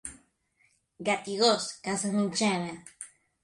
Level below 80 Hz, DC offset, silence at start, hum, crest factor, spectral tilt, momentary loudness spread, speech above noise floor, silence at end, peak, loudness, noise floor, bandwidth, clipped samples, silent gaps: -68 dBFS; under 0.1%; 0.05 s; none; 20 dB; -3.5 dB/octave; 20 LU; 41 dB; 0.35 s; -12 dBFS; -28 LUFS; -70 dBFS; 11.5 kHz; under 0.1%; none